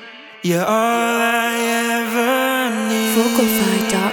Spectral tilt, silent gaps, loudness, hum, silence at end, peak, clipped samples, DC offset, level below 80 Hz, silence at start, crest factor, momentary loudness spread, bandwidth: -3.5 dB/octave; none; -17 LUFS; none; 0 s; -2 dBFS; under 0.1%; under 0.1%; -58 dBFS; 0 s; 14 dB; 3 LU; over 20 kHz